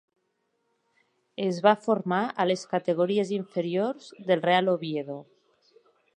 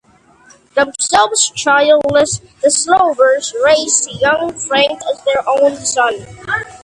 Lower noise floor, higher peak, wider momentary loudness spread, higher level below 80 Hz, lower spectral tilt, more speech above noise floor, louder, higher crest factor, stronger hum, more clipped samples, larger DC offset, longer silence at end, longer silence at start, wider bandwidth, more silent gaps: first, -75 dBFS vs -46 dBFS; second, -6 dBFS vs 0 dBFS; first, 11 LU vs 7 LU; second, -80 dBFS vs -50 dBFS; first, -6 dB/octave vs -1.5 dB/octave; first, 50 dB vs 33 dB; second, -26 LUFS vs -13 LUFS; first, 22 dB vs 14 dB; neither; neither; neither; first, 0.95 s vs 0.05 s; first, 1.4 s vs 0.75 s; second, 10 kHz vs 11.5 kHz; neither